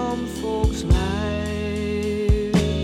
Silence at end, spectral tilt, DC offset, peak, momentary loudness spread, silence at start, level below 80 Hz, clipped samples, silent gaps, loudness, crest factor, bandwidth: 0 s; -6.5 dB/octave; under 0.1%; -4 dBFS; 6 LU; 0 s; -26 dBFS; under 0.1%; none; -23 LUFS; 18 dB; 14 kHz